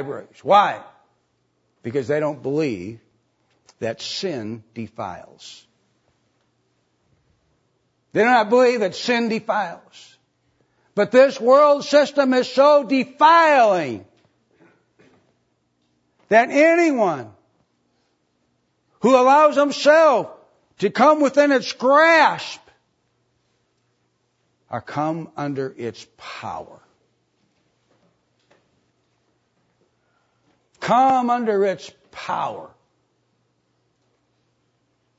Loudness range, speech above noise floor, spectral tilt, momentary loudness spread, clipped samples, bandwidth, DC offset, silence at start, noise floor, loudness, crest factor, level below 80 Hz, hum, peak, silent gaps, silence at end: 16 LU; 51 dB; -4.5 dB/octave; 20 LU; under 0.1%; 8 kHz; under 0.1%; 0 s; -68 dBFS; -18 LUFS; 20 dB; -70 dBFS; none; -2 dBFS; none; 2.5 s